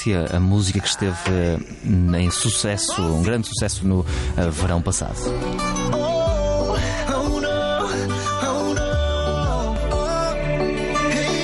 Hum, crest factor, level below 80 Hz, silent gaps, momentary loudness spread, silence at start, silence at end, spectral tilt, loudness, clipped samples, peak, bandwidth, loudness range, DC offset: none; 12 dB; -30 dBFS; none; 4 LU; 0 s; 0 s; -5 dB/octave; -21 LUFS; under 0.1%; -8 dBFS; 11.5 kHz; 2 LU; under 0.1%